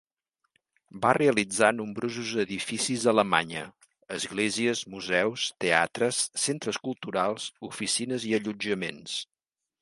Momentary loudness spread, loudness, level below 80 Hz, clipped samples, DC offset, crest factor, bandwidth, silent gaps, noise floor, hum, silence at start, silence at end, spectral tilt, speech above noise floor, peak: 11 LU; -27 LUFS; -68 dBFS; under 0.1%; under 0.1%; 24 dB; 11.5 kHz; none; -80 dBFS; none; 0.95 s; 0.6 s; -3 dB/octave; 52 dB; -4 dBFS